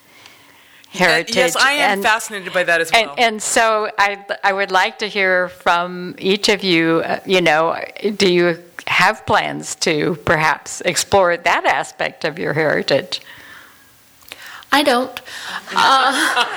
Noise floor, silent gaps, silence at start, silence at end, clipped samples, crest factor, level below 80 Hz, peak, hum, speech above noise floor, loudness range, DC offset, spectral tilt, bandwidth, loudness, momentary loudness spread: -48 dBFS; none; 0.95 s; 0 s; under 0.1%; 16 dB; -54 dBFS; -2 dBFS; none; 32 dB; 4 LU; under 0.1%; -3 dB/octave; over 20 kHz; -16 LUFS; 10 LU